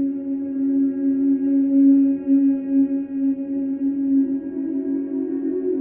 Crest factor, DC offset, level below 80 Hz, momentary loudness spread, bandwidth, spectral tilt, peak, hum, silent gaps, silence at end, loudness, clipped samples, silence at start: 12 dB; under 0.1%; -64 dBFS; 9 LU; 2.6 kHz; -11 dB/octave; -8 dBFS; none; none; 0 s; -20 LUFS; under 0.1%; 0 s